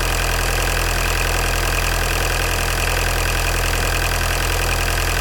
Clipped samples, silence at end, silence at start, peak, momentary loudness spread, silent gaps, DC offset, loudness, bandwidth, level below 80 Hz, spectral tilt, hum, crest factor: under 0.1%; 0 s; 0 s; -6 dBFS; 0 LU; none; under 0.1%; -19 LUFS; 19 kHz; -24 dBFS; -3 dB/octave; none; 14 dB